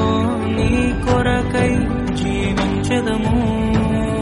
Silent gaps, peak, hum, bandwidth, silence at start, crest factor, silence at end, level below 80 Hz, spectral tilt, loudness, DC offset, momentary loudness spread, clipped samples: none; -2 dBFS; none; 11.5 kHz; 0 s; 14 dB; 0 s; -28 dBFS; -6.5 dB/octave; -18 LUFS; under 0.1%; 2 LU; under 0.1%